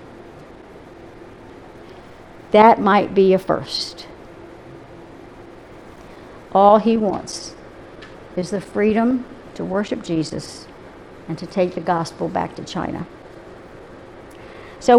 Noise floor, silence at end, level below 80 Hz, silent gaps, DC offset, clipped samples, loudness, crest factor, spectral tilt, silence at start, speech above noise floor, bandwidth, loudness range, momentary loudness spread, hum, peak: -41 dBFS; 0 s; -50 dBFS; none; under 0.1%; under 0.1%; -19 LUFS; 20 dB; -6 dB/octave; 0 s; 23 dB; 12.5 kHz; 8 LU; 26 LU; none; 0 dBFS